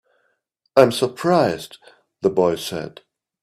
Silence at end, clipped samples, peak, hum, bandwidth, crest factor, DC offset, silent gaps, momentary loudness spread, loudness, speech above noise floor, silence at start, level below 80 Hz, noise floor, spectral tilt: 0.55 s; under 0.1%; 0 dBFS; none; 15 kHz; 20 dB; under 0.1%; none; 15 LU; -19 LUFS; 52 dB; 0.75 s; -60 dBFS; -70 dBFS; -5.5 dB/octave